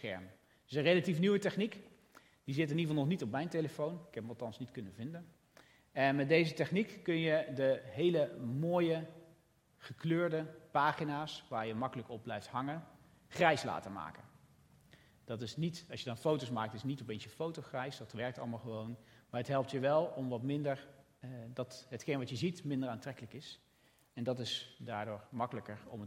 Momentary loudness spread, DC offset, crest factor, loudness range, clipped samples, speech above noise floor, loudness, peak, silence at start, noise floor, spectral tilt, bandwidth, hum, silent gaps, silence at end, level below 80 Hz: 15 LU; under 0.1%; 24 dB; 7 LU; under 0.1%; 33 dB; -37 LUFS; -14 dBFS; 0 s; -70 dBFS; -6.5 dB/octave; 16 kHz; none; none; 0 s; -76 dBFS